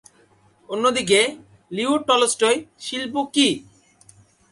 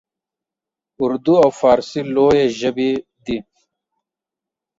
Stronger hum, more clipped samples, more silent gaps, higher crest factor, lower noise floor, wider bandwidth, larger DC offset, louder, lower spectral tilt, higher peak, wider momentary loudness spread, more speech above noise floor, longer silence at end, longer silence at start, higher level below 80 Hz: neither; neither; neither; about the same, 18 dB vs 16 dB; second, -57 dBFS vs -87 dBFS; first, 11.5 kHz vs 7.8 kHz; neither; second, -20 LUFS vs -17 LUFS; second, -2.5 dB/octave vs -6 dB/octave; about the same, -4 dBFS vs -2 dBFS; about the same, 12 LU vs 13 LU; second, 37 dB vs 72 dB; second, 0.9 s vs 1.35 s; second, 0.7 s vs 1 s; second, -64 dBFS vs -52 dBFS